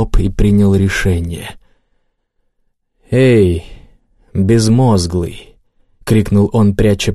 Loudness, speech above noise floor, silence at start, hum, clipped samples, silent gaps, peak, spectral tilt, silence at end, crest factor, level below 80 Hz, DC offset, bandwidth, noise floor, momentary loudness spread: -13 LUFS; 52 dB; 0 s; none; under 0.1%; none; -2 dBFS; -6.5 dB/octave; 0 s; 12 dB; -26 dBFS; under 0.1%; 13 kHz; -64 dBFS; 14 LU